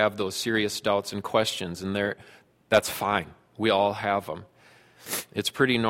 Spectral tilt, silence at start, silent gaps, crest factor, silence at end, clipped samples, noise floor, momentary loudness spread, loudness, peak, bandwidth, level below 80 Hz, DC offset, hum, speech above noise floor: -4 dB/octave; 0 s; none; 22 dB; 0 s; under 0.1%; -56 dBFS; 10 LU; -26 LUFS; -6 dBFS; 16.5 kHz; -60 dBFS; under 0.1%; none; 30 dB